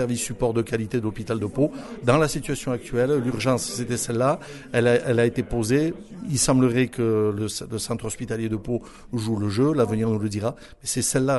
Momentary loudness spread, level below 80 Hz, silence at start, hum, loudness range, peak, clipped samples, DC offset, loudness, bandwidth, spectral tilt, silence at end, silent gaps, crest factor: 8 LU; -46 dBFS; 0 s; none; 3 LU; -4 dBFS; under 0.1%; under 0.1%; -24 LUFS; 12 kHz; -5.5 dB/octave; 0 s; none; 20 dB